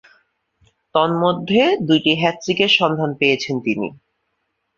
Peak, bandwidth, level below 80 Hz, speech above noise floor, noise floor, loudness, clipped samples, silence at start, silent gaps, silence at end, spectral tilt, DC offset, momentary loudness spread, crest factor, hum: -2 dBFS; 7.4 kHz; -60 dBFS; 55 dB; -72 dBFS; -17 LUFS; under 0.1%; 0.95 s; none; 0.85 s; -5 dB/octave; under 0.1%; 8 LU; 18 dB; none